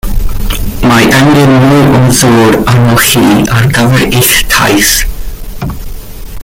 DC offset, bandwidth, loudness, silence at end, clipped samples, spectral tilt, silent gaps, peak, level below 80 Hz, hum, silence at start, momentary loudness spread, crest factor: under 0.1%; over 20 kHz; -6 LUFS; 0 s; 0.5%; -4.5 dB/octave; none; 0 dBFS; -18 dBFS; none; 0.05 s; 16 LU; 6 dB